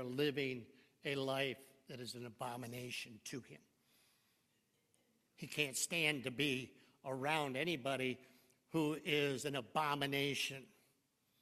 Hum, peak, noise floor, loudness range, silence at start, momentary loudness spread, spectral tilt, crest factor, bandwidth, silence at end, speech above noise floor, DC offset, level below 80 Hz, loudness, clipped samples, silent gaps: none; -20 dBFS; -80 dBFS; 11 LU; 0 s; 14 LU; -3.5 dB/octave; 22 dB; 14.5 kHz; 0.75 s; 39 dB; under 0.1%; -82 dBFS; -40 LUFS; under 0.1%; none